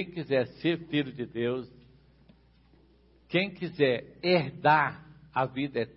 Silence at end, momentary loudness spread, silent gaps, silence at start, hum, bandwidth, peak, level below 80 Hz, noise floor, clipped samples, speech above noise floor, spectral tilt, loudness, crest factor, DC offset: 0.05 s; 10 LU; none; 0 s; none; 5.8 kHz; -10 dBFS; -64 dBFS; -61 dBFS; under 0.1%; 33 dB; -10 dB/octave; -29 LUFS; 20 dB; under 0.1%